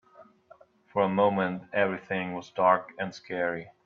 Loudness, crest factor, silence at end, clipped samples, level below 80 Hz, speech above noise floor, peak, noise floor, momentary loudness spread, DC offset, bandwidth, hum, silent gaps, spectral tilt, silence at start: -28 LUFS; 20 dB; 0.15 s; under 0.1%; -74 dBFS; 30 dB; -8 dBFS; -58 dBFS; 10 LU; under 0.1%; 7.2 kHz; none; none; -7 dB/octave; 0.2 s